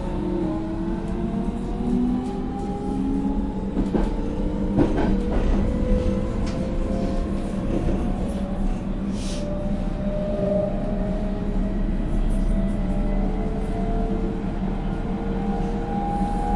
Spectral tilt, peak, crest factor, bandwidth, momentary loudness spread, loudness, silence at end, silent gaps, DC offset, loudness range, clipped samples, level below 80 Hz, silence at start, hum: -8 dB/octave; -6 dBFS; 18 dB; 11 kHz; 4 LU; -26 LUFS; 0 s; none; under 0.1%; 3 LU; under 0.1%; -26 dBFS; 0 s; none